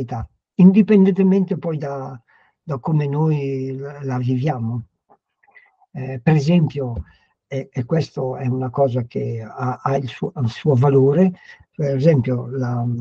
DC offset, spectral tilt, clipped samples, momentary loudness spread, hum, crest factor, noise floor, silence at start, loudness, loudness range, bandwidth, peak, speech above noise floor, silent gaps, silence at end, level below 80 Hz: under 0.1%; -9.5 dB/octave; under 0.1%; 16 LU; none; 18 dB; -59 dBFS; 0 s; -19 LUFS; 6 LU; 7.2 kHz; -2 dBFS; 41 dB; none; 0 s; -50 dBFS